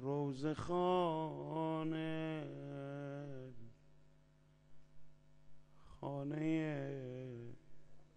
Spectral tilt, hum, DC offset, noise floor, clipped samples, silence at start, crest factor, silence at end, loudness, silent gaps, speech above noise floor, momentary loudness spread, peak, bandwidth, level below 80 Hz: -8 dB/octave; none; under 0.1%; -69 dBFS; under 0.1%; 0 s; 18 dB; 0.1 s; -42 LUFS; none; 31 dB; 15 LU; -24 dBFS; 9.8 kHz; -70 dBFS